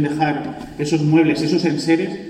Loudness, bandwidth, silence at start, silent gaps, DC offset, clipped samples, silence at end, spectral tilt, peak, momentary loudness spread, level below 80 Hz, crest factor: -18 LUFS; 10.5 kHz; 0 s; none; under 0.1%; under 0.1%; 0 s; -6.5 dB/octave; -4 dBFS; 11 LU; -52 dBFS; 14 dB